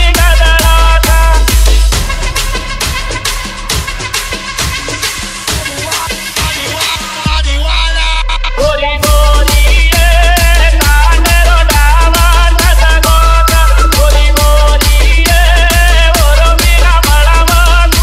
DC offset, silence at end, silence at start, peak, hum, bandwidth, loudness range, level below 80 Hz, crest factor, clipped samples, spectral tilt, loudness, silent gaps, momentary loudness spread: under 0.1%; 0 s; 0 s; 0 dBFS; none; 16 kHz; 7 LU; -8 dBFS; 8 dB; 0.1%; -3 dB/octave; -9 LUFS; none; 7 LU